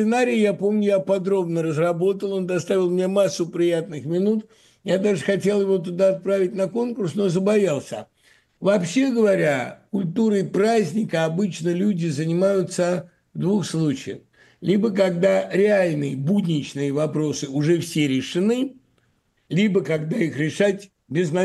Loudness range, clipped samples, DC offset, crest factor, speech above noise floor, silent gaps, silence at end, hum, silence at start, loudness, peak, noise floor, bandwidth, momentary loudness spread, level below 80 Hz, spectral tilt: 2 LU; under 0.1%; under 0.1%; 16 dB; 45 dB; none; 0 s; none; 0 s; -22 LUFS; -6 dBFS; -66 dBFS; 12.5 kHz; 7 LU; -68 dBFS; -6.5 dB/octave